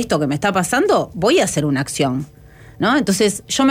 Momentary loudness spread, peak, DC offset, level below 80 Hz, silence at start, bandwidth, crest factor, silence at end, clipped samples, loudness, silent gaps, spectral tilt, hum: 5 LU; -4 dBFS; under 0.1%; -48 dBFS; 0 s; 16.5 kHz; 12 dB; 0 s; under 0.1%; -17 LUFS; none; -4.5 dB/octave; none